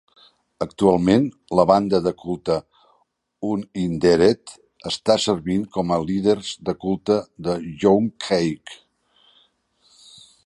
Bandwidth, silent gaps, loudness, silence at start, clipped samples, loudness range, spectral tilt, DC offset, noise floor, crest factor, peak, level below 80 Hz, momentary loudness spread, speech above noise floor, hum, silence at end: 11.5 kHz; none; -21 LUFS; 0.6 s; under 0.1%; 3 LU; -6 dB/octave; under 0.1%; -66 dBFS; 20 dB; -2 dBFS; -50 dBFS; 11 LU; 46 dB; none; 1.7 s